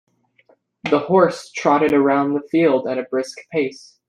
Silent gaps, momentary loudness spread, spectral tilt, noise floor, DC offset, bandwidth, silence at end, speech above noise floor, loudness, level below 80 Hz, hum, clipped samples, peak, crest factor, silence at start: none; 10 LU; -6 dB/octave; -58 dBFS; under 0.1%; 11 kHz; 0.3 s; 40 dB; -19 LUFS; -64 dBFS; none; under 0.1%; -2 dBFS; 16 dB; 0.85 s